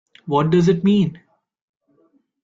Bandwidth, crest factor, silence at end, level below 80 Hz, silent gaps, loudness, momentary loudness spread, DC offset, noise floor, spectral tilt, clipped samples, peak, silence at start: 7.6 kHz; 16 dB; 1.25 s; -54 dBFS; none; -18 LUFS; 7 LU; under 0.1%; -61 dBFS; -8 dB/octave; under 0.1%; -6 dBFS; 0.25 s